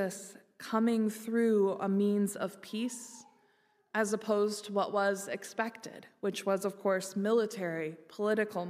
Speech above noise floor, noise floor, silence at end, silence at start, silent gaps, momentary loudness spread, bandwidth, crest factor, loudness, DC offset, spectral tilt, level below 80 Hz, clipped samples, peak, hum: 38 dB; -70 dBFS; 0 s; 0 s; none; 13 LU; 15.5 kHz; 18 dB; -32 LUFS; under 0.1%; -5 dB/octave; -86 dBFS; under 0.1%; -16 dBFS; none